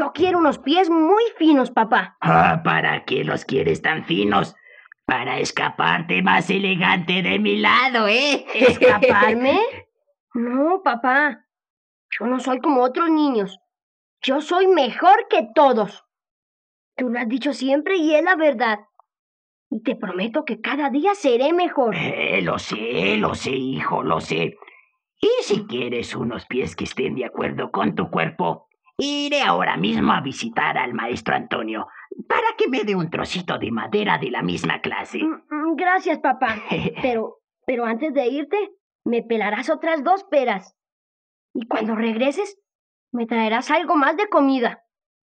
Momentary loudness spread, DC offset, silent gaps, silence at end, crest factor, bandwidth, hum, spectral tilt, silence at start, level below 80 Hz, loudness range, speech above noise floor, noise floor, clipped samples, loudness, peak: 10 LU; under 0.1%; 10.20-10.27 s, 11.70-12.09 s, 13.83-14.17 s, 16.31-16.92 s, 19.19-19.71 s, 38.80-38.99 s, 40.92-41.54 s, 42.75-43.07 s; 0.5 s; 20 dB; 9.6 kHz; none; -5.5 dB/octave; 0 s; -62 dBFS; 6 LU; 36 dB; -55 dBFS; under 0.1%; -20 LUFS; -2 dBFS